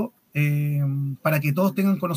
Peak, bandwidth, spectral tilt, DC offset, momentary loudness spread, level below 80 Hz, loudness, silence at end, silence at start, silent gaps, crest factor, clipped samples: -8 dBFS; 16 kHz; -8 dB/octave; under 0.1%; 4 LU; -72 dBFS; -23 LUFS; 0 s; 0 s; none; 16 dB; under 0.1%